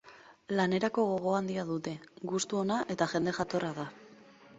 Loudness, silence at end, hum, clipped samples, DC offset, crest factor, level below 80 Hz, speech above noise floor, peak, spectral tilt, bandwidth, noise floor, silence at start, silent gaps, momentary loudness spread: -32 LUFS; 0 s; none; under 0.1%; under 0.1%; 20 dB; -70 dBFS; 24 dB; -12 dBFS; -5 dB/octave; 8.2 kHz; -56 dBFS; 0.05 s; none; 10 LU